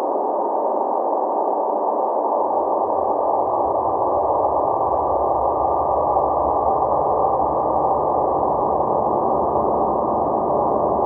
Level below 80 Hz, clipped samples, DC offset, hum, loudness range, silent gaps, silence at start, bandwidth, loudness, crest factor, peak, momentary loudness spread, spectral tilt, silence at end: -44 dBFS; under 0.1%; under 0.1%; none; 1 LU; none; 0 s; 2.3 kHz; -20 LUFS; 12 dB; -6 dBFS; 2 LU; -13 dB/octave; 0 s